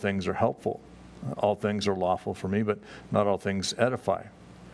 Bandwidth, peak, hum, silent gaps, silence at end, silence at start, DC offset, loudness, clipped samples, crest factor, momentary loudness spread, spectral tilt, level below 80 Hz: 11 kHz; -8 dBFS; none; none; 0 s; 0 s; under 0.1%; -29 LUFS; under 0.1%; 22 dB; 9 LU; -5.5 dB/octave; -60 dBFS